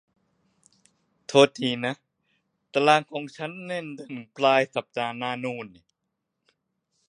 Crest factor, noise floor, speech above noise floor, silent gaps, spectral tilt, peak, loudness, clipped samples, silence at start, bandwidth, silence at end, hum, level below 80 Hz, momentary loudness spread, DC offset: 26 dB; -81 dBFS; 56 dB; none; -4.5 dB/octave; -2 dBFS; -25 LUFS; under 0.1%; 1.3 s; 10.5 kHz; 1.4 s; none; -76 dBFS; 18 LU; under 0.1%